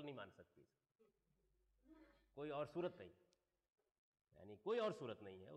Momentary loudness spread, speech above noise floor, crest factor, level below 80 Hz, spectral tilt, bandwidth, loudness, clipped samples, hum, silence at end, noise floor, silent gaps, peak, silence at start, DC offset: 20 LU; 36 dB; 18 dB; -84 dBFS; -6.5 dB/octave; 9.6 kHz; -48 LUFS; under 0.1%; none; 0 s; -84 dBFS; 3.91-4.12 s, 4.21-4.25 s; -34 dBFS; 0 s; under 0.1%